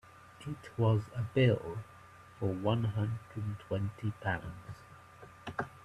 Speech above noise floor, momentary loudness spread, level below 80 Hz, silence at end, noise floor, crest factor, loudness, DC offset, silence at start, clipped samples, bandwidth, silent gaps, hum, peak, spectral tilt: 21 dB; 23 LU; -62 dBFS; 0 s; -54 dBFS; 18 dB; -35 LUFS; under 0.1%; 0.25 s; under 0.1%; 11 kHz; none; none; -16 dBFS; -8 dB/octave